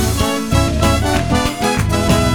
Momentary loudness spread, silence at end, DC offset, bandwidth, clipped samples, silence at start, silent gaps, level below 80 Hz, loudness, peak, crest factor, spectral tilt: 3 LU; 0 s; under 0.1%; over 20 kHz; under 0.1%; 0 s; none; -22 dBFS; -16 LUFS; 0 dBFS; 14 dB; -5 dB/octave